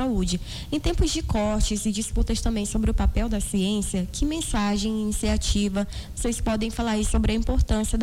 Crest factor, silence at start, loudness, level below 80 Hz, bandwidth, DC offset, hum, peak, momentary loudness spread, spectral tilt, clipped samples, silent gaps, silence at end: 14 dB; 0 s; -25 LUFS; -28 dBFS; 16 kHz; under 0.1%; none; -10 dBFS; 4 LU; -5 dB/octave; under 0.1%; none; 0 s